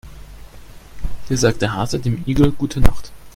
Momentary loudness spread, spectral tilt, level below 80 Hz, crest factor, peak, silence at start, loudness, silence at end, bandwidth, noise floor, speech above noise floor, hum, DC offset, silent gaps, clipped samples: 17 LU; -6 dB/octave; -26 dBFS; 18 dB; 0 dBFS; 0.05 s; -19 LUFS; 0.05 s; 15.5 kHz; -38 dBFS; 23 dB; none; under 0.1%; none; under 0.1%